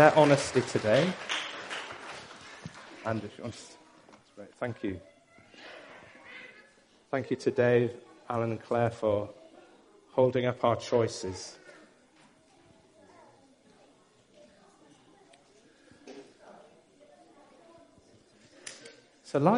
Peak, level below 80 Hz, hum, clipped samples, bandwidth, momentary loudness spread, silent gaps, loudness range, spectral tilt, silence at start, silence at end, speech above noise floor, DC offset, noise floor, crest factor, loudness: -4 dBFS; -70 dBFS; none; under 0.1%; 10.5 kHz; 25 LU; none; 13 LU; -5.5 dB/octave; 0 s; 0 s; 35 dB; under 0.1%; -62 dBFS; 28 dB; -30 LUFS